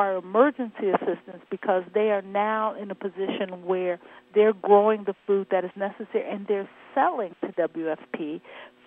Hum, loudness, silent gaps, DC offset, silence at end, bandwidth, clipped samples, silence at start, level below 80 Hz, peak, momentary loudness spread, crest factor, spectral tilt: none; -26 LUFS; none; under 0.1%; 0.2 s; 3.9 kHz; under 0.1%; 0 s; -82 dBFS; -4 dBFS; 12 LU; 20 dB; -9 dB/octave